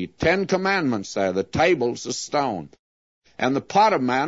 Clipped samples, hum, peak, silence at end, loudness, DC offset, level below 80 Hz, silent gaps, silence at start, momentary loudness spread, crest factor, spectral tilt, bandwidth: under 0.1%; none; -6 dBFS; 0 s; -22 LUFS; under 0.1%; -52 dBFS; 2.79-3.22 s; 0 s; 8 LU; 18 dB; -4.5 dB/octave; 8 kHz